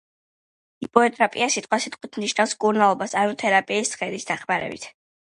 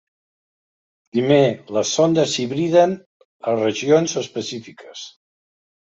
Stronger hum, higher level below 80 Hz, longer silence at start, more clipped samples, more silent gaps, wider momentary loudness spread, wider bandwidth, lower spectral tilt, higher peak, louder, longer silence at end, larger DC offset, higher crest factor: neither; about the same, -68 dBFS vs -64 dBFS; second, 0.8 s vs 1.15 s; neither; second, none vs 3.06-3.39 s; second, 11 LU vs 19 LU; first, 11.5 kHz vs 8 kHz; second, -3 dB/octave vs -5 dB/octave; about the same, 0 dBFS vs -2 dBFS; second, -22 LUFS vs -19 LUFS; second, 0.35 s vs 0.75 s; neither; about the same, 22 dB vs 18 dB